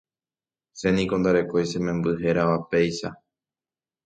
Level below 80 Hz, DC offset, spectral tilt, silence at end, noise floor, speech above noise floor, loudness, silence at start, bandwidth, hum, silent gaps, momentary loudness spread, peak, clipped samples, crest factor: -52 dBFS; under 0.1%; -6.5 dB/octave; 0.9 s; under -90 dBFS; over 67 dB; -24 LUFS; 0.75 s; 9.2 kHz; none; none; 6 LU; -8 dBFS; under 0.1%; 18 dB